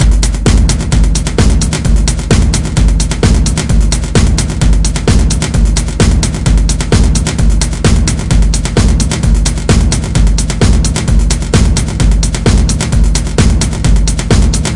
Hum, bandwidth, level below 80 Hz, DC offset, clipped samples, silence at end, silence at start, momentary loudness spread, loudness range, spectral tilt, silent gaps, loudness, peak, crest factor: none; 11.5 kHz; -10 dBFS; 2%; 0.3%; 0 s; 0 s; 2 LU; 0 LU; -5 dB/octave; none; -11 LUFS; 0 dBFS; 8 dB